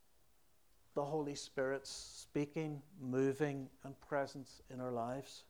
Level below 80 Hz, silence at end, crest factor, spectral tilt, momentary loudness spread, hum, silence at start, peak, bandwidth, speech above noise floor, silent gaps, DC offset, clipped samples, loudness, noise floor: -74 dBFS; 0.05 s; 18 dB; -5.5 dB/octave; 11 LU; none; 0.95 s; -24 dBFS; over 20 kHz; 33 dB; none; under 0.1%; under 0.1%; -42 LUFS; -75 dBFS